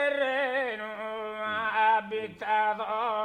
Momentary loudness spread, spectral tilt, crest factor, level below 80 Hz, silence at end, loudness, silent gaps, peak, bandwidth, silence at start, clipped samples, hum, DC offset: 10 LU; -4.5 dB/octave; 16 dB; -70 dBFS; 0 s; -28 LUFS; none; -14 dBFS; 9.4 kHz; 0 s; under 0.1%; none; under 0.1%